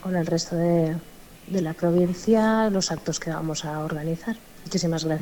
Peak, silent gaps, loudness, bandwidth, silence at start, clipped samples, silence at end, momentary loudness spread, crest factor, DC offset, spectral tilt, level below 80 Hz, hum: -8 dBFS; none; -25 LUFS; 19 kHz; 0 s; under 0.1%; 0 s; 9 LU; 16 dB; under 0.1%; -5.5 dB/octave; -52 dBFS; none